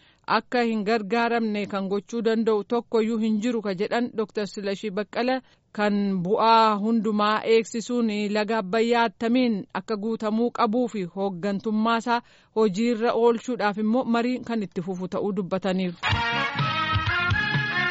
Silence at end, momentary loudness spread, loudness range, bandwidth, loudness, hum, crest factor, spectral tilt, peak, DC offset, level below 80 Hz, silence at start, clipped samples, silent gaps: 0 s; 7 LU; 3 LU; 8 kHz; -24 LUFS; none; 16 dB; -4 dB/octave; -8 dBFS; under 0.1%; -52 dBFS; 0.3 s; under 0.1%; none